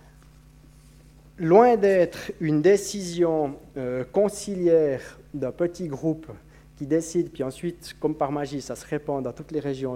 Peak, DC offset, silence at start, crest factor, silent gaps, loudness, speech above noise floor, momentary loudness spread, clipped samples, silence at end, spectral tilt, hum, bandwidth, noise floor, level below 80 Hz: -4 dBFS; under 0.1%; 1.4 s; 20 dB; none; -24 LUFS; 27 dB; 14 LU; under 0.1%; 0 s; -6 dB/octave; none; 16 kHz; -51 dBFS; -54 dBFS